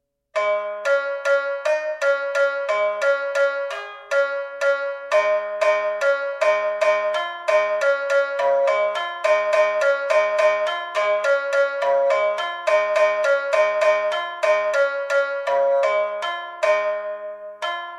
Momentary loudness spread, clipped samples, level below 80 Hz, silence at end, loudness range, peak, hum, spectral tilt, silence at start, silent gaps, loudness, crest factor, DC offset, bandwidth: 6 LU; under 0.1%; -72 dBFS; 0 s; 2 LU; -6 dBFS; none; 0 dB/octave; 0.35 s; none; -21 LUFS; 14 dB; under 0.1%; 11 kHz